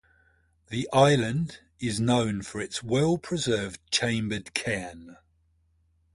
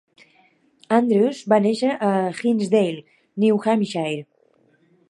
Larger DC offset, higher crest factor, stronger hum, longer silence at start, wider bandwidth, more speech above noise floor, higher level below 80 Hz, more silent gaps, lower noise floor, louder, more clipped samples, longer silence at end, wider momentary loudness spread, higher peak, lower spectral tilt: neither; about the same, 22 dB vs 18 dB; neither; second, 0.7 s vs 0.9 s; about the same, 11.5 kHz vs 11 kHz; about the same, 41 dB vs 41 dB; first, -56 dBFS vs -74 dBFS; neither; first, -67 dBFS vs -60 dBFS; second, -27 LUFS vs -20 LUFS; neither; first, 1 s vs 0.85 s; first, 13 LU vs 9 LU; about the same, -6 dBFS vs -4 dBFS; second, -5 dB/octave vs -6.5 dB/octave